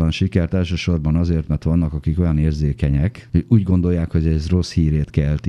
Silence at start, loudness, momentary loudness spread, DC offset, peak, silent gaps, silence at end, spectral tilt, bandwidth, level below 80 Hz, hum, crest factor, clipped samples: 0 s; -19 LUFS; 4 LU; under 0.1%; -2 dBFS; none; 0 s; -8 dB/octave; 9.6 kHz; -26 dBFS; none; 16 dB; under 0.1%